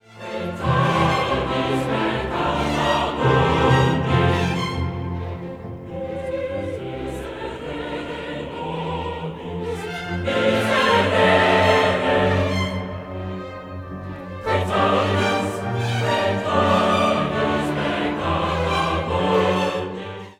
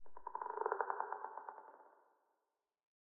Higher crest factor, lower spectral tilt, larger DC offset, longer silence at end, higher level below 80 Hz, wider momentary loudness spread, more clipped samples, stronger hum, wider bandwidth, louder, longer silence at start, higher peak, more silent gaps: second, 18 dB vs 26 dB; first, -6 dB/octave vs 4.5 dB/octave; neither; second, 0.05 s vs 0.3 s; first, -40 dBFS vs -86 dBFS; second, 14 LU vs 19 LU; neither; neither; first, 15.5 kHz vs 2.7 kHz; first, -21 LUFS vs -44 LUFS; about the same, 0.1 s vs 0 s; first, -2 dBFS vs -20 dBFS; neither